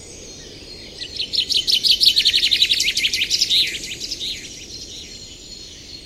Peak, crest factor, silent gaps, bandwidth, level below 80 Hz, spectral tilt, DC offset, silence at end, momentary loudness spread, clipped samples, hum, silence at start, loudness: 0 dBFS; 20 dB; none; 16 kHz; -48 dBFS; 0.5 dB/octave; under 0.1%; 0 s; 23 LU; under 0.1%; none; 0 s; -16 LUFS